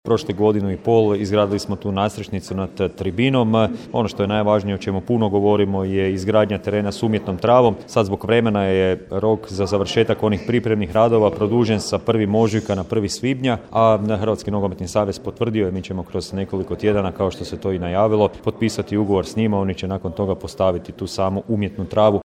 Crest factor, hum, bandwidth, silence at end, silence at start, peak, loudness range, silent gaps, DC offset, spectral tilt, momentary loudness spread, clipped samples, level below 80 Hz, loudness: 18 dB; none; 14 kHz; 0.05 s; 0.05 s; 0 dBFS; 3 LU; none; under 0.1%; -6.5 dB/octave; 7 LU; under 0.1%; -46 dBFS; -20 LUFS